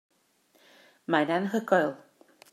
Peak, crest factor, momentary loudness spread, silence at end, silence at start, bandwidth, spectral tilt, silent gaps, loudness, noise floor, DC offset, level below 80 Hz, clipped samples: -8 dBFS; 22 dB; 17 LU; 0.55 s; 1.1 s; 14.5 kHz; -6 dB/octave; none; -27 LUFS; -67 dBFS; under 0.1%; -84 dBFS; under 0.1%